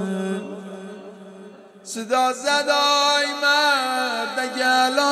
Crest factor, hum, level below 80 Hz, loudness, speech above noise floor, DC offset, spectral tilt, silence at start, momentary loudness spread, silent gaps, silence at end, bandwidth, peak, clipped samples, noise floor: 16 dB; none; -74 dBFS; -19 LUFS; 23 dB; under 0.1%; -2 dB/octave; 0 s; 19 LU; none; 0 s; 14.5 kHz; -6 dBFS; under 0.1%; -43 dBFS